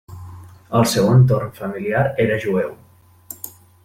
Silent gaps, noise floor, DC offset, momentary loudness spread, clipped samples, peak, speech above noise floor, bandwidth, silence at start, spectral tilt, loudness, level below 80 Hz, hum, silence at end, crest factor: none; -41 dBFS; under 0.1%; 23 LU; under 0.1%; -4 dBFS; 24 dB; 16.5 kHz; 0.1 s; -6.5 dB/octave; -18 LUFS; -48 dBFS; none; 0.35 s; 16 dB